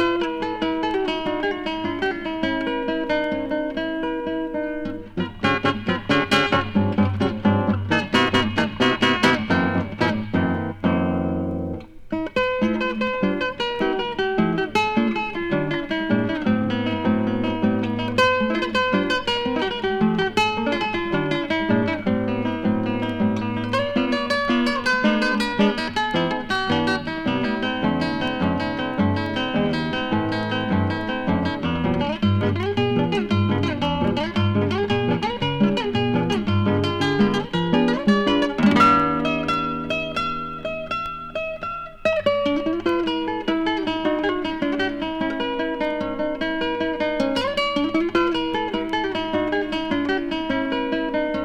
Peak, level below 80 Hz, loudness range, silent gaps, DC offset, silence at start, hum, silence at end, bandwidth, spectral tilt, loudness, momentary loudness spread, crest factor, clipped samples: -4 dBFS; -44 dBFS; 4 LU; none; under 0.1%; 0 s; none; 0 s; 12 kHz; -6 dB/octave; -22 LUFS; 6 LU; 18 dB; under 0.1%